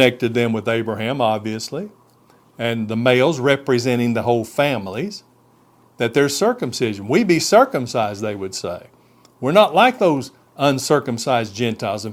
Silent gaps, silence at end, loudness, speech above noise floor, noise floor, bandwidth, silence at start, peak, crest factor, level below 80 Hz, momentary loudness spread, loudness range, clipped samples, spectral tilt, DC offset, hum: none; 0 s; -19 LUFS; 36 dB; -54 dBFS; 16.5 kHz; 0 s; 0 dBFS; 18 dB; -62 dBFS; 12 LU; 3 LU; under 0.1%; -5 dB/octave; under 0.1%; none